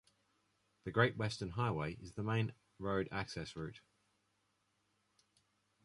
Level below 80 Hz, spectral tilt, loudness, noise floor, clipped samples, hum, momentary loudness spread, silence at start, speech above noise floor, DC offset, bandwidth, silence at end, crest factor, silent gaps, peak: -64 dBFS; -6 dB/octave; -39 LUFS; -81 dBFS; under 0.1%; none; 12 LU; 0.85 s; 42 dB; under 0.1%; 11.5 kHz; 2.05 s; 24 dB; none; -16 dBFS